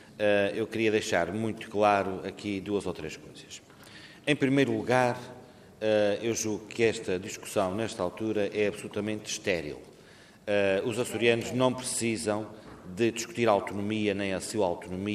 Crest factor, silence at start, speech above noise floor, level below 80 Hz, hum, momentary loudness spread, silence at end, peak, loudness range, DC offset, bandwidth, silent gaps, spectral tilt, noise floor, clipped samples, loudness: 20 dB; 0 s; 25 dB; -64 dBFS; none; 15 LU; 0 s; -8 dBFS; 3 LU; under 0.1%; 15 kHz; none; -4.5 dB/octave; -54 dBFS; under 0.1%; -29 LUFS